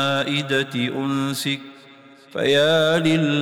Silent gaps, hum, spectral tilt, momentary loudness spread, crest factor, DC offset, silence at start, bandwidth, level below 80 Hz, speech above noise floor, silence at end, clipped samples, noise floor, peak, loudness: none; none; -5 dB/octave; 9 LU; 12 dB; under 0.1%; 0 s; 19 kHz; -60 dBFS; 27 dB; 0 s; under 0.1%; -47 dBFS; -8 dBFS; -20 LUFS